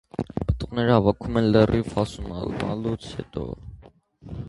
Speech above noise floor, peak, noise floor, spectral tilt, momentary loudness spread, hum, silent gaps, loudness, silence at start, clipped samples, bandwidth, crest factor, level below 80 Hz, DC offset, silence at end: 28 dB; -2 dBFS; -51 dBFS; -7.5 dB/octave; 14 LU; none; none; -24 LUFS; 0.2 s; under 0.1%; 11.5 kHz; 22 dB; -38 dBFS; under 0.1%; 0 s